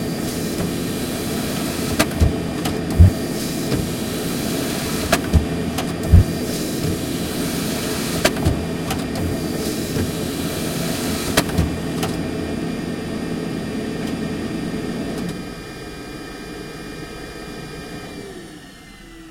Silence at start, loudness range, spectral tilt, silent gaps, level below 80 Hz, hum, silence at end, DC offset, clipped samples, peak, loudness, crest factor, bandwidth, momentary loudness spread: 0 s; 10 LU; -5 dB/octave; none; -32 dBFS; none; 0 s; under 0.1%; under 0.1%; 0 dBFS; -22 LUFS; 22 dB; 16.5 kHz; 14 LU